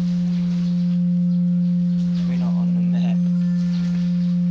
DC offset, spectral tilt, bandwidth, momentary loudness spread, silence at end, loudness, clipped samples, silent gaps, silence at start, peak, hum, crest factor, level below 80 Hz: under 0.1%; -9.5 dB/octave; 6.4 kHz; 2 LU; 0 s; -20 LUFS; under 0.1%; none; 0 s; -14 dBFS; none; 6 dB; -50 dBFS